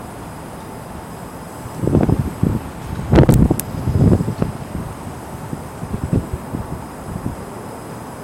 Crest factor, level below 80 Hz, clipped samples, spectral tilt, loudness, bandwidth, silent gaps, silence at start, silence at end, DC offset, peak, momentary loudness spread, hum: 20 dB; -30 dBFS; under 0.1%; -7.5 dB/octave; -19 LUFS; 16.5 kHz; none; 0 s; 0 s; under 0.1%; 0 dBFS; 17 LU; none